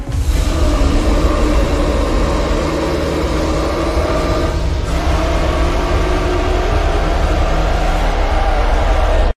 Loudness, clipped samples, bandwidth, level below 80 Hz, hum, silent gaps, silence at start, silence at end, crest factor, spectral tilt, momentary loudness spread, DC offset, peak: -16 LUFS; under 0.1%; 13.5 kHz; -16 dBFS; none; none; 0 s; 0.05 s; 10 dB; -6 dB/octave; 2 LU; under 0.1%; -2 dBFS